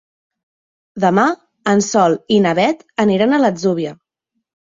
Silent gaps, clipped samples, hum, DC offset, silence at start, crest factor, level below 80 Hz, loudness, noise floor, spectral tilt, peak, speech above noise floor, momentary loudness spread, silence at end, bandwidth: none; under 0.1%; none; under 0.1%; 0.95 s; 16 dB; -60 dBFS; -15 LUFS; -74 dBFS; -5 dB/octave; -2 dBFS; 60 dB; 8 LU; 0.85 s; 7.8 kHz